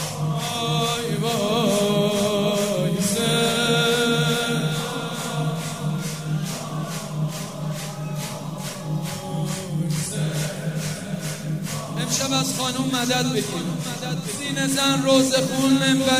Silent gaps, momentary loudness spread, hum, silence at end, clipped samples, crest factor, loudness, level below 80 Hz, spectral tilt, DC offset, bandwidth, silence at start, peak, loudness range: none; 10 LU; none; 0 s; under 0.1%; 18 dB; -23 LUFS; -56 dBFS; -4 dB/octave; 0.2%; 16 kHz; 0 s; -6 dBFS; 8 LU